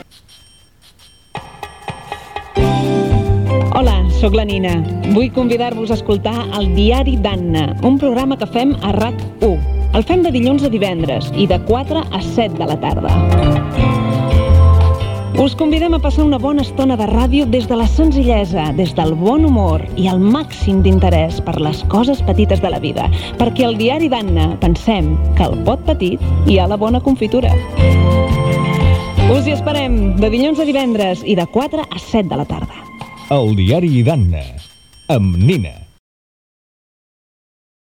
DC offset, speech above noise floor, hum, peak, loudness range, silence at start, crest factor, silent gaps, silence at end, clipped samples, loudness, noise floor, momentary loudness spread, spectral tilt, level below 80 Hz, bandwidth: 0.2%; 34 dB; none; 0 dBFS; 3 LU; 1.35 s; 14 dB; none; 2.15 s; under 0.1%; -14 LUFS; -47 dBFS; 6 LU; -7.5 dB/octave; -22 dBFS; 12.5 kHz